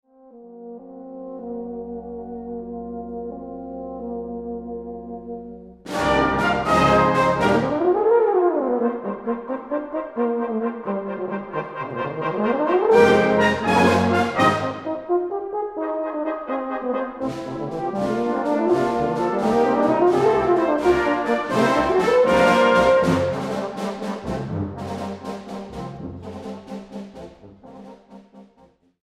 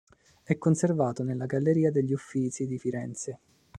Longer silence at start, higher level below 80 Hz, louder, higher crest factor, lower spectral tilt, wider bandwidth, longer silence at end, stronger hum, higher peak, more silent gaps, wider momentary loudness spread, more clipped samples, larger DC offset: second, 0.35 s vs 0.5 s; first, -48 dBFS vs -66 dBFS; first, -21 LUFS vs -28 LUFS; about the same, 20 dB vs 20 dB; second, -6 dB/octave vs -7.5 dB/octave; first, 14 kHz vs 10.5 kHz; first, 0.6 s vs 0 s; neither; first, -2 dBFS vs -10 dBFS; neither; first, 18 LU vs 11 LU; neither; neither